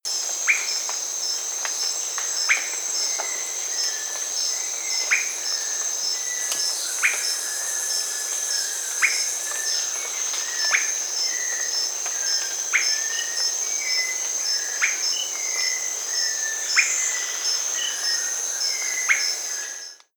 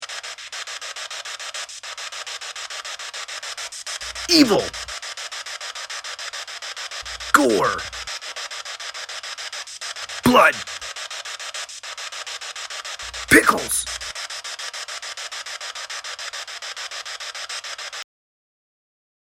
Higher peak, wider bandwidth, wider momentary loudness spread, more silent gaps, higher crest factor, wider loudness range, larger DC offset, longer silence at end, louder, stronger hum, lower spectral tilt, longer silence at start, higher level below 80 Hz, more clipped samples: second, -4 dBFS vs 0 dBFS; first, over 20 kHz vs 16 kHz; second, 4 LU vs 15 LU; neither; second, 20 dB vs 26 dB; second, 1 LU vs 8 LU; neither; second, 0.2 s vs 1.35 s; about the same, -22 LUFS vs -24 LUFS; neither; second, 5.5 dB/octave vs -2 dB/octave; about the same, 0.05 s vs 0 s; second, under -90 dBFS vs -52 dBFS; neither